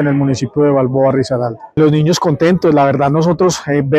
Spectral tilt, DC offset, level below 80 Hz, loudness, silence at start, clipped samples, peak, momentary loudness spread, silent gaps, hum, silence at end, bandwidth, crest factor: -6.5 dB/octave; under 0.1%; -44 dBFS; -13 LUFS; 0 s; under 0.1%; -2 dBFS; 5 LU; none; none; 0 s; 13.5 kHz; 10 dB